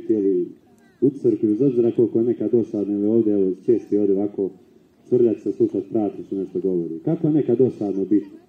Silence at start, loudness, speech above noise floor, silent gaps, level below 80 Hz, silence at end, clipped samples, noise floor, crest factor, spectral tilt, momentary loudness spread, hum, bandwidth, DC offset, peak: 0 s; -21 LUFS; 31 dB; none; -70 dBFS; 0.1 s; under 0.1%; -51 dBFS; 14 dB; -11 dB/octave; 6 LU; none; 3.6 kHz; under 0.1%; -6 dBFS